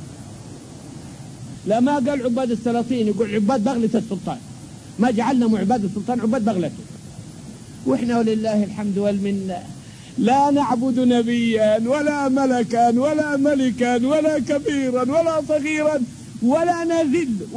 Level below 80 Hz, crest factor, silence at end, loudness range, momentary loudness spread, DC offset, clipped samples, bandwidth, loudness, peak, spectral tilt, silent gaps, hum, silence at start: -54 dBFS; 14 dB; 0 s; 4 LU; 20 LU; under 0.1%; under 0.1%; 10.5 kHz; -20 LUFS; -6 dBFS; -6 dB/octave; none; none; 0 s